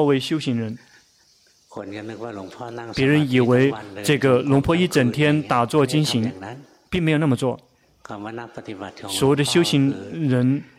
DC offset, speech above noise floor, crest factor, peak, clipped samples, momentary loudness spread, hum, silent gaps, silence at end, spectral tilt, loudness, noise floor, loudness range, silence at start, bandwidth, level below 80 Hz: under 0.1%; 37 dB; 16 dB; -4 dBFS; under 0.1%; 17 LU; none; none; 0.15 s; -6 dB/octave; -20 LUFS; -58 dBFS; 6 LU; 0 s; 15.5 kHz; -52 dBFS